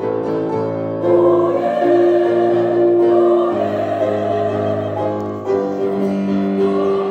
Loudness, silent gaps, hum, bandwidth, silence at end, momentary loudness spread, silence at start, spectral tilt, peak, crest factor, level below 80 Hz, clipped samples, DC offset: -16 LUFS; none; none; 6.6 kHz; 0 s; 7 LU; 0 s; -8.5 dB/octave; -2 dBFS; 14 dB; -60 dBFS; under 0.1%; under 0.1%